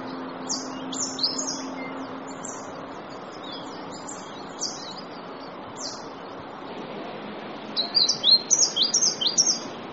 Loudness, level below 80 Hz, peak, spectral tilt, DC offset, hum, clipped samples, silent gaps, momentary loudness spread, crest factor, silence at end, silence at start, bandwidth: -23 LUFS; -68 dBFS; -4 dBFS; -0.5 dB/octave; under 0.1%; none; under 0.1%; none; 19 LU; 24 dB; 0 s; 0 s; 8 kHz